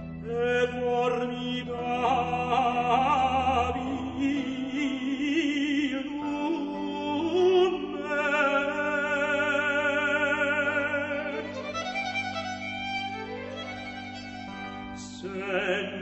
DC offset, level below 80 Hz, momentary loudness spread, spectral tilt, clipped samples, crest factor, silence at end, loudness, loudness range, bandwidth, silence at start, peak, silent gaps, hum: under 0.1%; -54 dBFS; 12 LU; -5 dB/octave; under 0.1%; 16 dB; 0 s; -28 LUFS; 8 LU; 8.4 kHz; 0 s; -12 dBFS; none; none